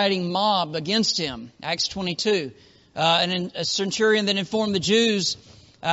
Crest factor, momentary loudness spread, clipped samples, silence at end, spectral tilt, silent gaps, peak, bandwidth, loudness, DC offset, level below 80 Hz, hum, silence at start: 18 dB; 10 LU; under 0.1%; 0 s; -2.5 dB/octave; none; -6 dBFS; 8 kHz; -22 LUFS; under 0.1%; -58 dBFS; none; 0 s